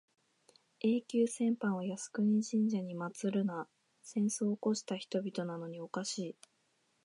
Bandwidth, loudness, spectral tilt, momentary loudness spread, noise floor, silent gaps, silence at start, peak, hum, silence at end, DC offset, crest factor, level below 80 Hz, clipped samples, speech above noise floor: 11.5 kHz; -36 LUFS; -5.5 dB/octave; 10 LU; -76 dBFS; none; 0.85 s; -20 dBFS; none; 0.7 s; under 0.1%; 14 dB; -86 dBFS; under 0.1%; 42 dB